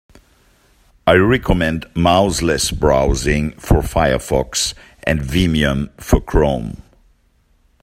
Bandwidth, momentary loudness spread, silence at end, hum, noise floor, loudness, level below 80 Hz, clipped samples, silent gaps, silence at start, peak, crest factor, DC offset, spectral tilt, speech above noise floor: 16 kHz; 7 LU; 1.05 s; none; -57 dBFS; -17 LUFS; -26 dBFS; under 0.1%; none; 1.05 s; 0 dBFS; 16 dB; under 0.1%; -5 dB/octave; 42 dB